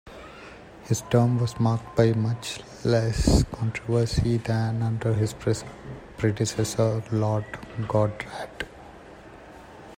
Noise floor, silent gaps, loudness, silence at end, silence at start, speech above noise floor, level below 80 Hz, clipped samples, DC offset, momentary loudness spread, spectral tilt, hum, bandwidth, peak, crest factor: -45 dBFS; none; -25 LUFS; 0.05 s; 0.05 s; 21 dB; -38 dBFS; under 0.1%; under 0.1%; 22 LU; -6.5 dB/octave; none; 15.5 kHz; -4 dBFS; 20 dB